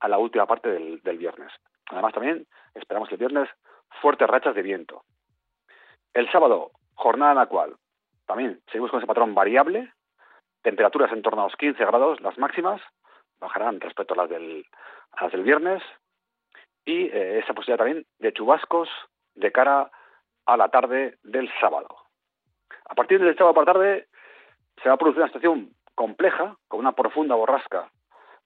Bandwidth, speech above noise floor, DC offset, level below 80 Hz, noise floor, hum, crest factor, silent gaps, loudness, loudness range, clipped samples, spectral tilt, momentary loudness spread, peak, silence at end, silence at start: 4.5 kHz; 59 dB; under 0.1%; -78 dBFS; -81 dBFS; none; 18 dB; none; -23 LUFS; 6 LU; under 0.1%; -1.5 dB/octave; 13 LU; -4 dBFS; 0.6 s; 0 s